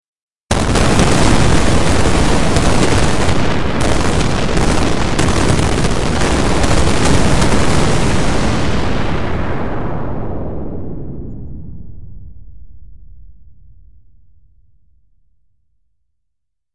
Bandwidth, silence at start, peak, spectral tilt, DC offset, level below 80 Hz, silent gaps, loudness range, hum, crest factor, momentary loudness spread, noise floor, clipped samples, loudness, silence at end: 11.5 kHz; 0 s; 0 dBFS; -5 dB/octave; 10%; -22 dBFS; 0.07-0.16 s, 0.22-0.28 s, 0.40-0.48 s; 15 LU; none; 14 dB; 14 LU; -77 dBFS; under 0.1%; -15 LUFS; 0 s